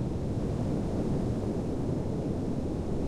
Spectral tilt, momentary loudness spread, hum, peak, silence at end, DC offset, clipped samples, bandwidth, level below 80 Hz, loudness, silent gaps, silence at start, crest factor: -8.5 dB/octave; 2 LU; none; -18 dBFS; 0 s; under 0.1%; under 0.1%; 12.5 kHz; -40 dBFS; -32 LUFS; none; 0 s; 12 dB